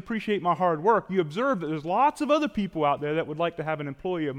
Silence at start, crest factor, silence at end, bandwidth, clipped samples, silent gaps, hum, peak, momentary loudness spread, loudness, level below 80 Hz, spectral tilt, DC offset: 0.05 s; 16 dB; 0 s; 13.5 kHz; under 0.1%; none; none; -10 dBFS; 7 LU; -26 LUFS; -58 dBFS; -6.5 dB/octave; under 0.1%